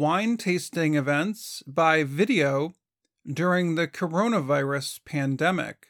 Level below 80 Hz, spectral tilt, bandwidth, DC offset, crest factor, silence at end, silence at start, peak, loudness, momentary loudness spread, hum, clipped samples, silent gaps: -72 dBFS; -5.5 dB/octave; 18.5 kHz; under 0.1%; 18 dB; 0.15 s; 0 s; -6 dBFS; -25 LUFS; 9 LU; none; under 0.1%; none